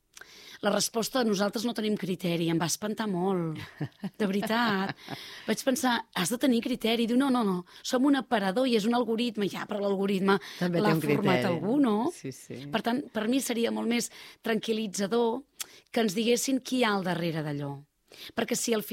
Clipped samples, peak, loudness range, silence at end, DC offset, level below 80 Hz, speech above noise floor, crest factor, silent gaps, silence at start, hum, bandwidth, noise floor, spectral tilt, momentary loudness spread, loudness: under 0.1%; -12 dBFS; 3 LU; 0 s; under 0.1%; -70 dBFS; 23 dB; 16 dB; none; 0.3 s; none; 16 kHz; -51 dBFS; -4.5 dB/octave; 11 LU; -28 LUFS